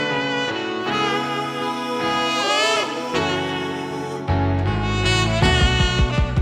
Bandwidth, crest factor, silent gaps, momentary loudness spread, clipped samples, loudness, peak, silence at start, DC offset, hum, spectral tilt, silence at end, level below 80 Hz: 13.5 kHz; 16 dB; none; 7 LU; under 0.1%; -20 LUFS; -4 dBFS; 0 s; under 0.1%; none; -4.5 dB/octave; 0 s; -30 dBFS